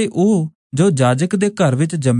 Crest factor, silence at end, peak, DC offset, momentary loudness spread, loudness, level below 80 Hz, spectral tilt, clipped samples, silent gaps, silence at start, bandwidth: 14 dB; 0 s; -2 dBFS; under 0.1%; 4 LU; -16 LUFS; -58 dBFS; -6.5 dB/octave; under 0.1%; 0.55-0.70 s; 0 s; 11 kHz